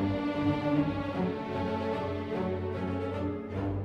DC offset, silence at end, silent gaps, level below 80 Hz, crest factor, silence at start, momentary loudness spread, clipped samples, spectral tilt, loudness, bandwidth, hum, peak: under 0.1%; 0 s; none; -54 dBFS; 16 dB; 0 s; 5 LU; under 0.1%; -8.5 dB/octave; -32 LUFS; 7.8 kHz; none; -16 dBFS